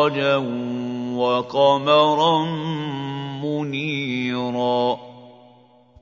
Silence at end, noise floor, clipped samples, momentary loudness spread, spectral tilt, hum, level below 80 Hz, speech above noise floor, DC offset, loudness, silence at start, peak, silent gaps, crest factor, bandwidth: 0.7 s; -52 dBFS; under 0.1%; 11 LU; -6.5 dB/octave; none; -66 dBFS; 31 dB; under 0.1%; -21 LUFS; 0 s; -4 dBFS; none; 18 dB; 7.4 kHz